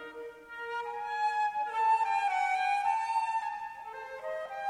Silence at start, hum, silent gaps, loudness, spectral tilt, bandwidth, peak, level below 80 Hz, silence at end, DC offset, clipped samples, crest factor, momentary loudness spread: 0 s; none; none; -31 LUFS; -0.5 dB/octave; 12 kHz; -18 dBFS; -74 dBFS; 0 s; under 0.1%; under 0.1%; 14 dB; 14 LU